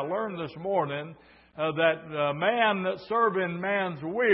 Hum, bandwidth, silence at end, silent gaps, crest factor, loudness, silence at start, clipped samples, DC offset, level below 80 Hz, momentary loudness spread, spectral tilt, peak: none; 5.8 kHz; 0 s; none; 18 dB; -28 LUFS; 0 s; under 0.1%; under 0.1%; -70 dBFS; 9 LU; -9.5 dB/octave; -8 dBFS